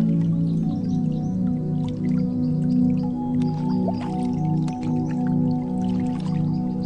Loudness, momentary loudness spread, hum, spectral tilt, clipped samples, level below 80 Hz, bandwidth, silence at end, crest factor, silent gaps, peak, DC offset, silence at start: -23 LUFS; 4 LU; none; -9.5 dB/octave; under 0.1%; -46 dBFS; 8.4 kHz; 0 s; 12 dB; none; -12 dBFS; under 0.1%; 0 s